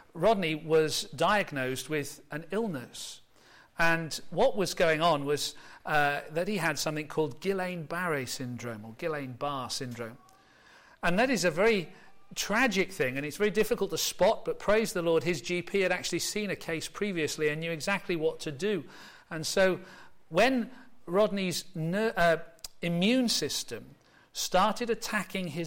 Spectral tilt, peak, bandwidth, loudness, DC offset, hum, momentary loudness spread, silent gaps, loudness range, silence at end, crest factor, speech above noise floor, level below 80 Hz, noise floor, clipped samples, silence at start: -4 dB/octave; -14 dBFS; 16.5 kHz; -29 LUFS; under 0.1%; none; 12 LU; none; 4 LU; 0 s; 16 dB; 29 dB; -56 dBFS; -59 dBFS; under 0.1%; 0.15 s